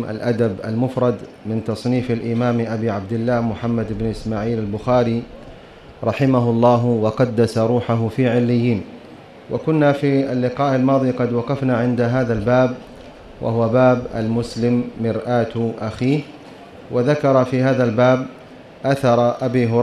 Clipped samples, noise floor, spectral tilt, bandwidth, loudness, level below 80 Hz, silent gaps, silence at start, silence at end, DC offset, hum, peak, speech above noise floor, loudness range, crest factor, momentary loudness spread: under 0.1%; -41 dBFS; -8 dB/octave; 11 kHz; -19 LUFS; -46 dBFS; none; 0 s; 0 s; under 0.1%; none; -2 dBFS; 23 dB; 3 LU; 16 dB; 9 LU